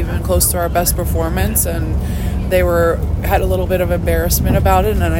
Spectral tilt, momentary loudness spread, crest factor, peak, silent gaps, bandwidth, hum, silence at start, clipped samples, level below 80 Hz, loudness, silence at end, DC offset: -5 dB/octave; 6 LU; 14 dB; 0 dBFS; none; 17 kHz; none; 0 s; under 0.1%; -20 dBFS; -16 LUFS; 0 s; under 0.1%